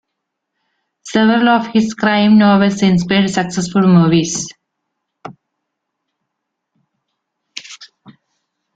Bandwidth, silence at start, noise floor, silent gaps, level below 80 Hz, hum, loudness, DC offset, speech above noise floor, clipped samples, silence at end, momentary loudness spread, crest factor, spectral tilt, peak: 9.2 kHz; 1.05 s; -76 dBFS; none; -52 dBFS; none; -13 LUFS; under 0.1%; 64 dB; under 0.1%; 0.9 s; 20 LU; 14 dB; -5.5 dB/octave; -2 dBFS